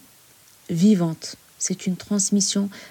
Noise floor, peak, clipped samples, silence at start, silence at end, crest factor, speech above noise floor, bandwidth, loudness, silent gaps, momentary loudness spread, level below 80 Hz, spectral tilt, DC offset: -53 dBFS; -8 dBFS; under 0.1%; 0.7 s; 0 s; 16 dB; 31 dB; 17 kHz; -22 LUFS; none; 11 LU; -66 dBFS; -4.5 dB/octave; under 0.1%